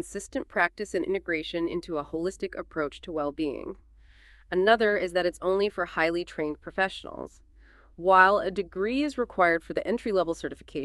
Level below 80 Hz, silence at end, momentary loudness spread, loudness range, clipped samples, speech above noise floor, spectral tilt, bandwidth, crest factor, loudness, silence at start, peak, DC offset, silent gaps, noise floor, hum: -54 dBFS; 0 s; 13 LU; 6 LU; under 0.1%; 28 dB; -4.5 dB/octave; 12 kHz; 24 dB; -27 LUFS; 0 s; -4 dBFS; under 0.1%; none; -55 dBFS; none